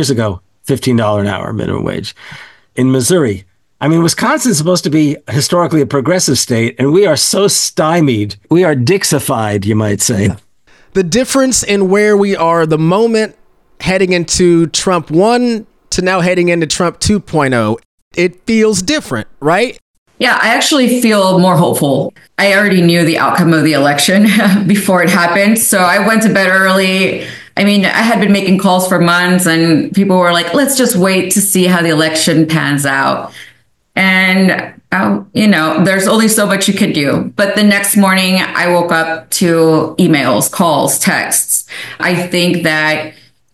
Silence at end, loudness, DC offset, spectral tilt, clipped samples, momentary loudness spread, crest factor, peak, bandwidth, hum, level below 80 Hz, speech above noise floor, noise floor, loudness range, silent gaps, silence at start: 0.4 s; -11 LUFS; 0.1%; -4 dB/octave; under 0.1%; 8 LU; 10 dB; 0 dBFS; 14 kHz; none; -44 dBFS; 35 dB; -46 dBFS; 4 LU; 17.85-18.11 s, 19.82-20.06 s; 0 s